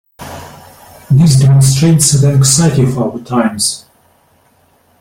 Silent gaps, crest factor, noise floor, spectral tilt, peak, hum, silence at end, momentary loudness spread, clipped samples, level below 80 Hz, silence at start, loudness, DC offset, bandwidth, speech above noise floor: none; 12 dB; -52 dBFS; -5 dB/octave; 0 dBFS; none; 1.2 s; 21 LU; under 0.1%; -40 dBFS; 0.2 s; -10 LUFS; under 0.1%; 16.5 kHz; 43 dB